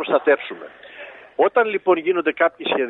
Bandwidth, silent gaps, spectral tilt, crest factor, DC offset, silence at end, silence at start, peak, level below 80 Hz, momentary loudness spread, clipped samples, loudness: 4.1 kHz; none; -7.5 dB/octave; 16 dB; under 0.1%; 0 s; 0 s; -4 dBFS; -72 dBFS; 20 LU; under 0.1%; -19 LUFS